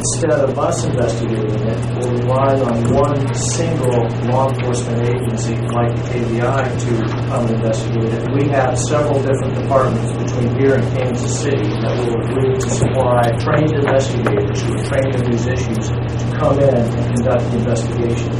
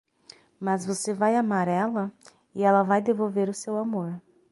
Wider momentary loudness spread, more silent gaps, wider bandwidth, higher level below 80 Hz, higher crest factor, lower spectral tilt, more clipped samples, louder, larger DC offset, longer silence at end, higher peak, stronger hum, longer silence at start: second, 4 LU vs 13 LU; neither; about the same, 11.5 kHz vs 11.5 kHz; first, -34 dBFS vs -74 dBFS; about the same, 16 dB vs 18 dB; about the same, -6.5 dB/octave vs -6 dB/octave; neither; first, -17 LUFS vs -26 LUFS; first, 0.2% vs under 0.1%; second, 0 s vs 0.3 s; first, 0 dBFS vs -8 dBFS; neither; second, 0 s vs 0.6 s